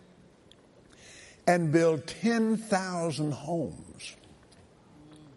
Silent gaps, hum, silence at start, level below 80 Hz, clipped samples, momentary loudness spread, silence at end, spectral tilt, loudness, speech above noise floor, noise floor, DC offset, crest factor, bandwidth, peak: none; none; 1.1 s; -66 dBFS; under 0.1%; 19 LU; 0.1 s; -6 dB/octave; -28 LUFS; 30 dB; -58 dBFS; under 0.1%; 20 dB; 11.5 kHz; -10 dBFS